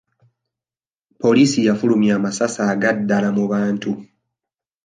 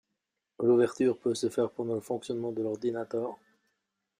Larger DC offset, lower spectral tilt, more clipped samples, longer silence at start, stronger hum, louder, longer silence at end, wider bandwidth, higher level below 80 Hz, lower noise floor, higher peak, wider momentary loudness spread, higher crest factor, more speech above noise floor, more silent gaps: neither; about the same, -5.5 dB/octave vs -6 dB/octave; neither; first, 1.2 s vs 0.6 s; neither; first, -18 LUFS vs -30 LUFS; about the same, 0.8 s vs 0.85 s; second, 9.6 kHz vs 15 kHz; first, -64 dBFS vs -74 dBFS; first, under -90 dBFS vs -84 dBFS; first, -4 dBFS vs -14 dBFS; second, 7 LU vs 10 LU; about the same, 16 dB vs 16 dB; first, over 73 dB vs 55 dB; neither